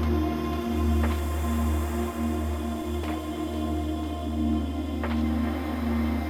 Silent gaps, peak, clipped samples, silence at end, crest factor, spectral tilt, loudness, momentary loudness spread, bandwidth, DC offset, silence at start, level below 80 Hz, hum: none; -12 dBFS; under 0.1%; 0 s; 14 dB; -7 dB/octave; -28 LUFS; 5 LU; 16 kHz; under 0.1%; 0 s; -32 dBFS; none